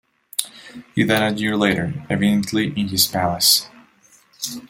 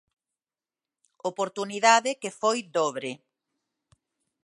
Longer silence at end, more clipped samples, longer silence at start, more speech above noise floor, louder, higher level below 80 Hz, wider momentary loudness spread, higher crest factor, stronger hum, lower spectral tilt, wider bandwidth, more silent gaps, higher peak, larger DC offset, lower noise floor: second, 0.05 s vs 1.3 s; neither; second, 0.4 s vs 1.25 s; second, 34 dB vs over 64 dB; first, -19 LUFS vs -26 LUFS; first, -54 dBFS vs -82 dBFS; about the same, 14 LU vs 15 LU; about the same, 20 dB vs 24 dB; neither; first, -3.5 dB/octave vs -2 dB/octave; first, 16.5 kHz vs 11.5 kHz; neither; first, 0 dBFS vs -4 dBFS; neither; second, -54 dBFS vs under -90 dBFS